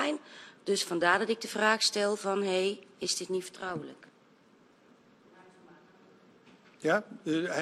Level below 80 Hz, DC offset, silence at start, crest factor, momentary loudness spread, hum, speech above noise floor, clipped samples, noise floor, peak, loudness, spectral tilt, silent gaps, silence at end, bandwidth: -80 dBFS; under 0.1%; 0 s; 24 dB; 12 LU; none; 32 dB; under 0.1%; -62 dBFS; -10 dBFS; -30 LUFS; -3 dB/octave; none; 0 s; 13 kHz